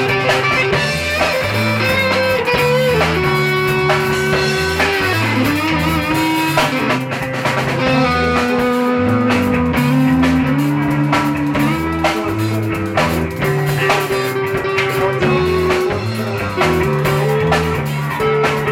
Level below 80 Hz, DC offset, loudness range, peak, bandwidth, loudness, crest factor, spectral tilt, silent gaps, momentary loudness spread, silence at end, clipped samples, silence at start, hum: -36 dBFS; under 0.1%; 2 LU; -4 dBFS; 17 kHz; -15 LUFS; 12 dB; -5.5 dB/octave; none; 4 LU; 0 s; under 0.1%; 0 s; none